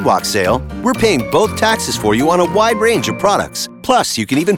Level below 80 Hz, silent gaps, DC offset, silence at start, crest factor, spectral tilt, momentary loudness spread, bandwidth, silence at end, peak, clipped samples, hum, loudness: -38 dBFS; none; 0.1%; 0 s; 14 dB; -4 dB/octave; 4 LU; 19 kHz; 0 s; 0 dBFS; under 0.1%; none; -14 LUFS